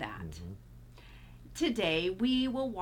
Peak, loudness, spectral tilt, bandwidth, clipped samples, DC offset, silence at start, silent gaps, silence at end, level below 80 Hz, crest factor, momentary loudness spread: -18 dBFS; -32 LUFS; -5 dB/octave; 16.5 kHz; under 0.1%; under 0.1%; 0 s; none; 0 s; -54 dBFS; 16 dB; 24 LU